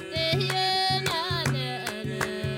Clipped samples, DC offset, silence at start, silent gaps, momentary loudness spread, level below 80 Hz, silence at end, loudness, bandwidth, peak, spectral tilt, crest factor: under 0.1%; under 0.1%; 0 s; none; 7 LU; -54 dBFS; 0 s; -26 LUFS; 17.5 kHz; -12 dBFS; -4 dB/octave; 14 dB